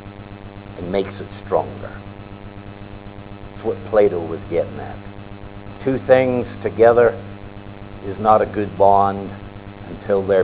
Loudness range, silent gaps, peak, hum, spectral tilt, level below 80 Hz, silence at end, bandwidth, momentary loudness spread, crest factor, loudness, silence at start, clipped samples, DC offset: 10 LU; none; 0 dBFS; none; -11 dB/octave; -42 dBFS; 0 s; 4 kHz; 22 LU; 20 dB; -18 LUFS; 0 s; under 0.1%; 0.1%